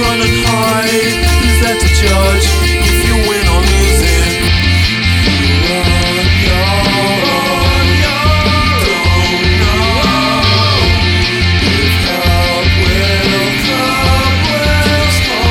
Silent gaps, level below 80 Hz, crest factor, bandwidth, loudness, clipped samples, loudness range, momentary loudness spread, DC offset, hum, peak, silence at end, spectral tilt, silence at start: none; -16 dBFS; 10 dB; 18.5 kHz; -10 LUFS; under 0.1%; 1 LU; 1 LU; under 0.1%; none; 0 dBFS; 0 s; -4.5 dB/octave; 0 s